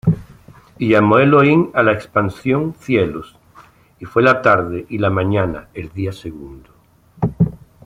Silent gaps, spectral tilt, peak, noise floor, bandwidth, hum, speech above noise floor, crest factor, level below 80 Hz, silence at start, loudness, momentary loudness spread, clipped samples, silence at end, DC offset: none; -8.5 dB/octave; -2 dBFS; -49 dBFS; 12 kHz; none; 33 dB; 16 dB; -44 dBFS; 0.05 s; -16 LUFS; 14 LU; under 0.1%; 0.3 s; under 0.1%